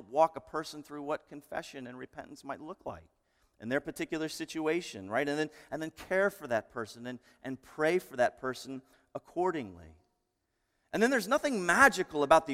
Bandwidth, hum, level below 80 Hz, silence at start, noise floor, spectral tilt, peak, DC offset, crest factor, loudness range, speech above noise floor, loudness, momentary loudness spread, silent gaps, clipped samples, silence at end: 16.5 kHz; none; -66 dBFS; 0 s; -81 dBFS; -4 dB/octave; -8 dBFS; under 0.1%; 26 dB; 10 LU; 48 dB; -32 LUFS; 18 LU; none; under 0.1%; 0 s